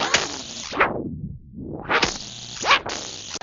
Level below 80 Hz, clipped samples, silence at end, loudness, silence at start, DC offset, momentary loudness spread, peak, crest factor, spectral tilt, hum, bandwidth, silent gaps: -48 dBFS; under 0.1%; 0.05 s; -23 LUFS; 0 s; under 0.1%; 16 LU; -2 dBFS; 24 dB; -2 dB/octave; none; 8 kHz; none